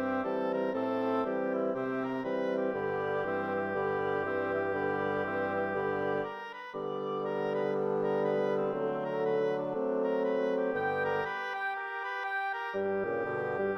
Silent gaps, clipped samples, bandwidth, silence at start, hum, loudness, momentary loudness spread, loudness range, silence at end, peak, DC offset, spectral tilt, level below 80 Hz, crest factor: none; under 0.1%; 6.4 kHz; 0 s; none; -32 LUFS; 4 LU; 2 LU; 0 s; -18 dBFS; under 0.1%; -7.5 dB/octave; -72 dBFS; 14 dB